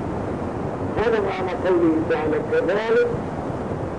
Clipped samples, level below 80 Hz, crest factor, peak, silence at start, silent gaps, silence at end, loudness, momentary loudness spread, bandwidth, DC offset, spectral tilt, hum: under 0.1%; -42 dBFS; 12 dB; -10 dBFS; 0 s; none; 0 s; -22 LUFS; 8 LU; 10 kHz; 0.3%; -7.5 dB/octave; none